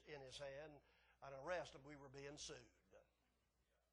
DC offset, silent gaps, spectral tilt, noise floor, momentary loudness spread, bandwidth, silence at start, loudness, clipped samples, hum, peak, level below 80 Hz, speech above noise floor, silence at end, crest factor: under 0.1%; none; -3.5 dB/octave; -85 dBFS; 12 LU; 10.5 kHz; 0 s; -55 LUFS; under 0.1%; none; -34 dBFS; -78 dBFS; 30 dB; 0.9 s; 24 dB